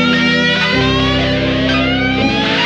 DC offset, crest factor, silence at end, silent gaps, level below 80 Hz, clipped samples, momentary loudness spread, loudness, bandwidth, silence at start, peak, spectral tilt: under 0.1%; 12 dB; 0 s; none; -30 dBFS; under 0.1%; 3 LU; -13 LUFS; 8.4 kHz; 0 s; -2 dBFS; -5.5 dB/octave